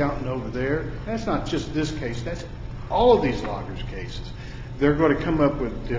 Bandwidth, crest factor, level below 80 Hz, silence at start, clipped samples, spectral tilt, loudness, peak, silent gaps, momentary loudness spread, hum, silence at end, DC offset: 7.8 kHz; 18 dB; -36 dBFS; 0 s; under 0.1%; -7 dB/octave; -24 LUFS; -6 dBFS; none; 16 LU; none; 0 s; under 0.1%